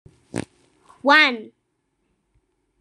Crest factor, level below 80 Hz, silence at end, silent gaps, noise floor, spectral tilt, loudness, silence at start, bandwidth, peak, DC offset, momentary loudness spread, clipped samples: 22 dB; -62 dBFS; 1.35 s; none; -72 dBFS; -3.5 dB/octave; -16 LUFS; 0.35 s; 12.5 kHz; -2 dBFS; under 0.1%; 19 LU; under 0.1%